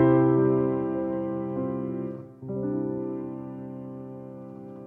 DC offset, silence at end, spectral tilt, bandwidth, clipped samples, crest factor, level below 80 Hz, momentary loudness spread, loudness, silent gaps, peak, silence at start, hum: under 0.1%; 0 s; -12 dB/octave; 3.4 kHz; under 0.1%; 18 dB; -60 dBFS; 19 LU; -28 LUFS; none; -10 dBFS; 0 s; none